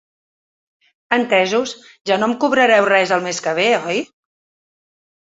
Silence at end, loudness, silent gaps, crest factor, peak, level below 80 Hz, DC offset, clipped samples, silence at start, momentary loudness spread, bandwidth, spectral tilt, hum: 1.15 s; -16 LUFS; 2.01-2.05 s; 18 dB; 0 dBFS; -66 dBFS; under 0.1%; under 0.1%; 1.1 s; 11 LU; 8 kHz; -3.5 dB/octave; none